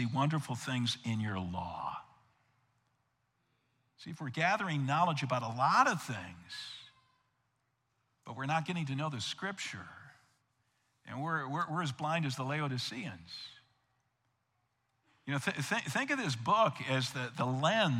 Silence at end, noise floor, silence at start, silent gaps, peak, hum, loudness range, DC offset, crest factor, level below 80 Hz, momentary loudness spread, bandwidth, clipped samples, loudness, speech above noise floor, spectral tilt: 0 s; -80 dBFS; 0 s; none; -14 dBFS; none; 8 LU; under 0.1%; 24 dB; -78 dBFS; 17 LU; 15.5 kHz; under 0.1%; -34 LUFS; 46 dB; -5 dB/octave